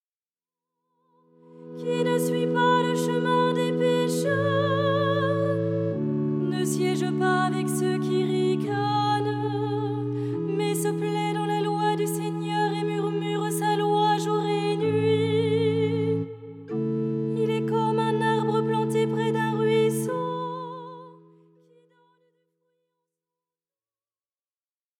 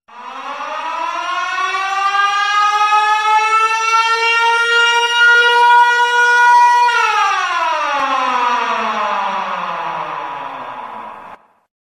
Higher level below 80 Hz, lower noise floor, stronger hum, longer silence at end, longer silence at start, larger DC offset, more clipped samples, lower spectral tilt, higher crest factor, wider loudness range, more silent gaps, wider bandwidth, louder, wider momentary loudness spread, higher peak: second, -82 dBFS vs -66 dBFS; first, under -90 dBFS vs -39 dBFS; neither; first, 3.85 s vs 0.45 s; first, 1.5 s vs 0.1 s; neither; neither; first, -6 dB/octave vs 0 dB/octave; about the same, 16 dB vs 14 dB; second, 3 LU vs 8 LU; neither; first, 17 kHz vs 14 kHz; second, -25 LUFS vs -13 LUFS; second, 6 LU vs 16 LU; second, -10 dBFS vs -2 dBFS